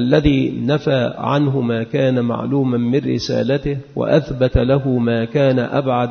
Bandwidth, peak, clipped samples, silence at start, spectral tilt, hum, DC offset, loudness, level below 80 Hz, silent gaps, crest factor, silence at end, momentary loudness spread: 6.6 kHz; 0 dBFS; under 0.1%; 0 s; -7.5 dB/octave; none; under 0.1%; -17 LUFS; -34 dBFS; none; 16 dB; 0 s; 4 LU